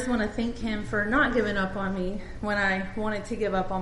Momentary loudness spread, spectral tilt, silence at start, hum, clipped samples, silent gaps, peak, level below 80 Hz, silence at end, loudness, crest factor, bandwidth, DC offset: 8 LU; -6 dB/octave; 0 s; none; under 0.1%; none; -10 dBFS; -40 dBFS; 0 s; -28 LUFS; 16 dB; 11.5 kHz; under 0.1%